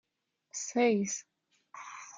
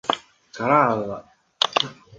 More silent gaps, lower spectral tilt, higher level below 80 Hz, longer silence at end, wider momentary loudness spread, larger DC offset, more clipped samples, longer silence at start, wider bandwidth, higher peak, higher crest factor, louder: neither; about the same, -4 dB/octave vs -4 dB/octave; second, -84 dBFS vs -62 dBFS; second, 0 s vs 0.25 s; first, 20 LU vs 13 LU; neither; neither; first, 0.55 s vs 0.05 s; about the same, 9.6 kHz vs 9.8 kHz; second, -16 dBFS vs -2 dBFS; about the same, 18 dB vs 22 dB; second, -31 LUFS vs -22 LUFS